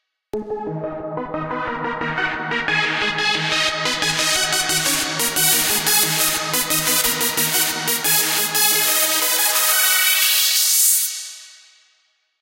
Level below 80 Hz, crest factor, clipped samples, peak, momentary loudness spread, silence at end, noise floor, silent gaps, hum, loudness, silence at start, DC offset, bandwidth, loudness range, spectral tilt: -52 dBFS; 20 dB; under 0.1%; 0 dBFS; 13 LU; 0.85 s; -64 dBFS; none; none; -16 LUFS; 0.35 s; under 0.1%; 16.5 kHz; 6 LU; -0.5 dB/octave